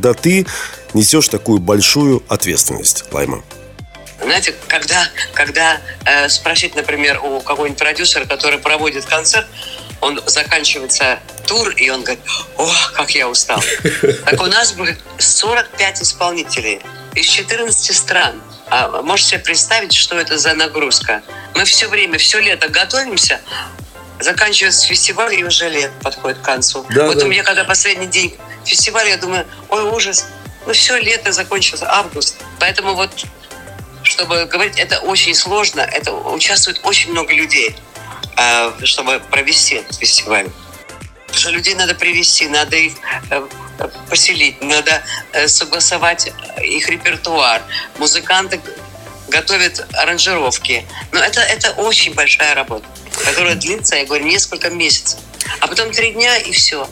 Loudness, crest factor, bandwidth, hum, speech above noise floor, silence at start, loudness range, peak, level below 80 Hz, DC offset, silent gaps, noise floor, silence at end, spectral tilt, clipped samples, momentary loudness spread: -12 LUFS; 14 dB; 17.5 kHz; none; 20 dB; 0 s; 2 LU; 0 dBFS; -44 dBFS; under 0.1%; none; -34 dBFS; 0 s; -1 dB/octave; under 0.1%; 10 LU